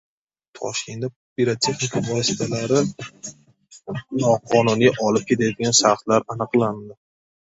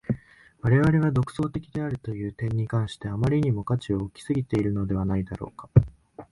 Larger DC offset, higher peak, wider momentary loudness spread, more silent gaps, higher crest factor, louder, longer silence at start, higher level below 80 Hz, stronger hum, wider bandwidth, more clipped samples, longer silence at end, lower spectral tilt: neither; about the same, -2 dBFS vs -4 dBFS; first, 17 LU vs 11 LU; first, 1.16-1.36 s vs none; about the same, 20 dB vs 22 dB; first, -20 LUFS vs -26 LUFS; first, 0.55 s vs 0.1 s; second, -58 dBFS vs -44 dBFS; neither; second, 8 kHz vs 11.5 kHz; neither; first, 0.5 s vs 0.05 s; second, -4 dB/octave vs -8.5 dB/octave